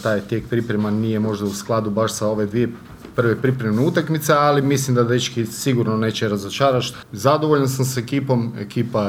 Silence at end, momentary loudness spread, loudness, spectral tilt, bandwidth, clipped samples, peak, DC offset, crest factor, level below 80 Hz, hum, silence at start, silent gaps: 0 s; 6 LU; -20 LUFS; -5.5 dB/octave; 16.5 kHz; under 0.1%; 0 dBFS; under 0.1%; 18 dB; -54 dBFS; none; 0 s; none